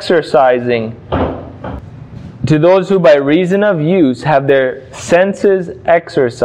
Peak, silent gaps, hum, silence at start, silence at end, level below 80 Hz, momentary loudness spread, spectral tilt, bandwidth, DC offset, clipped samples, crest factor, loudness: 0 dBFS; none; none; 0 s; 0 s; -38 dBFS; 17 LU; -6.5 dB/octave; 10.5 kHz; under 0.1%; under 0.1%; 12 dB; -12 LUFS